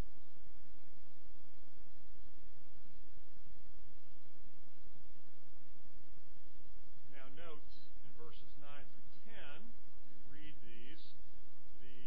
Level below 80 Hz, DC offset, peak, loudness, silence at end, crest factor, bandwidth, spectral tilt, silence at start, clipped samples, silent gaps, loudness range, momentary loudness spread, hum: -66 dBFS; 4%; -26 dBFS; -63 LUFS; 0 s; 20 dB; 5.4 kHz; -7.5 dB/octave; 0 s; under 0.1%; none; 9 LU; 12 LU; none